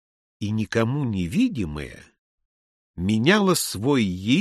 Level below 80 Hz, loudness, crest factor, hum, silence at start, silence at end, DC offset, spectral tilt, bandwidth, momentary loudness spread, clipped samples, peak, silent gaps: -48 dBFS; -23 LUFS; 18 dB; none; 0.4 s; 0 s; under 0.1%; -5 dB/octave; 13 kHz; 12 LU; under 0.1%; -4 dBFS; 2.19-2.38 s, 2.45-2.94 s